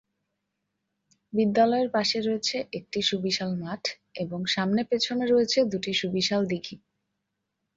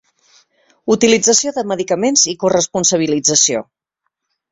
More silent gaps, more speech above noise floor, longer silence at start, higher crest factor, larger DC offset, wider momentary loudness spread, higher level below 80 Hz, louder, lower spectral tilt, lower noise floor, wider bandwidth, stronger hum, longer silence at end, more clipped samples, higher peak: neither; second, 55 dB vs 60 dB; first, 1.35 s vs 0.85 s; about the same, 16 dB vs 16 dB; neither; about the same, 10 LU vs 8 LU; second, -66 dBFS vs -56 dBFS; second, -26 LUFS vs -14 LUFS; first, -4.5 dB/octave vs -2.5 dB/octave; first, -81 dBFS vs -74 dBFS; about the same, 7.8 kHz vs 8 kHz; neither; about the same, 1 s vs 0.9 s; neither; second, -10 dBFS vs 0 dBFS